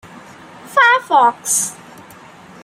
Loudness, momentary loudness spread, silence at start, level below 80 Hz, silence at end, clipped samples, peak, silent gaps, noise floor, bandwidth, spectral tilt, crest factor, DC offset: -14 LUFS; 7 LU; 0.15 s; -66 dBFS; 0.9 s; under 0.1%; -2 dBFS; none; -40 dBFS; 16 kHz; -0.5 dB/octave; 16 dB; under 0.1%